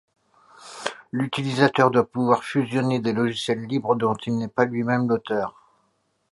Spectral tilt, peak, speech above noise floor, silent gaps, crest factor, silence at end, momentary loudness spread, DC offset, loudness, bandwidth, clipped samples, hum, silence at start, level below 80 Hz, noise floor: -6 dB/octave; -2 dBFS; 47 dB; none; 22 dB; 0.85 s; 10 LU; under 0.1%; -23 LUFS; 11.5 kHz; under 0.1%; none; 0.6 s; -64 dBFS; -69 dBFS